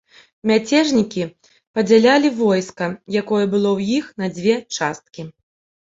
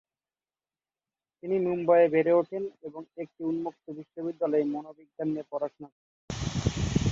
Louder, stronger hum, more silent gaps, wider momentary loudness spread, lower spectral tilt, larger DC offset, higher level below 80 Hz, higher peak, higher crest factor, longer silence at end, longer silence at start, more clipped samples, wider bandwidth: first, -18 LUFS vs -28 LUFS; neither; second, 1.67-1.74 s vs 5.92-6.28 s; second, 13 LU vs 20 LU; second, -5 dB/octave vs -6.5 dB/octave; neither; second, -60 dBFS vs -48 dBFS; first, -2 dBFS vs -12 dBFS; about the same, 16 dB vs 18 dB; first, 0.55 s vs 0 s; second, 0.45 s vs 1.45 s; neither; about the same, 7.8 kHz vs 7.8 kHz